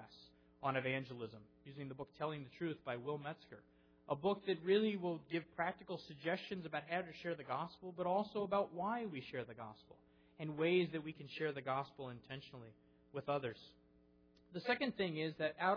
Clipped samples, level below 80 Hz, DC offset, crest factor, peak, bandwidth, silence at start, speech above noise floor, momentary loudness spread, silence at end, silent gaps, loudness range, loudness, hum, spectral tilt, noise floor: under 0.1%; -78 dBFS; under 0.1%; 18 dB; -24 dBFS; 5.4 kHz; 0 s; 28 dB; 16 LU; 0 s; none; 5 LU; -42 LUFS; none; -4 dB/octave; -70 dBFS